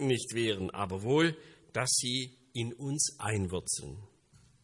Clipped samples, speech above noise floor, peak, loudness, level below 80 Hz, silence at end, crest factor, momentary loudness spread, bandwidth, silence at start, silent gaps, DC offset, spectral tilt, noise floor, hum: under 0.1%; 31 dB; -16 dBFS; -32 LUFS; -64 dBFS; 0.55 s; 18 dB; 11 LU; 11.5 kHz; 0 s; none; under 0.1%; -3.5 dB/octave; -63 dBFS; none